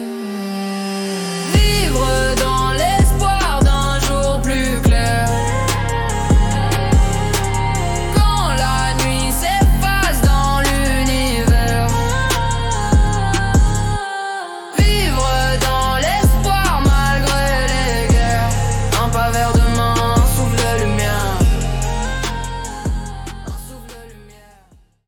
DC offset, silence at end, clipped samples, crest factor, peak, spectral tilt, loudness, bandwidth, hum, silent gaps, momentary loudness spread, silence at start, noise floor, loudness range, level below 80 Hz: under 0.1%; 0.85 s; under 0.1%; 12 dB; -4 dBFS; -4.5 dB/octave; -17 LUFS; 18 kHz; none; none; 8 LU; 0 s; -50 dBFS; 2 LU; -20 dBFS